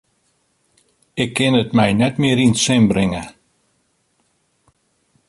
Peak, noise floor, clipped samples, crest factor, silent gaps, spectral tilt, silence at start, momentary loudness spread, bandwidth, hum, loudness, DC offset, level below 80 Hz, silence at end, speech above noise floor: -2 dBFS; -65 dBFS; under 0.1%; 18 dB; none; -5 dB/octave; 1.15 s; 12 LU; 11.5 kHz; none; -16 LUFS; under 0.1%; -48 dBFS; 2 s; 49 dB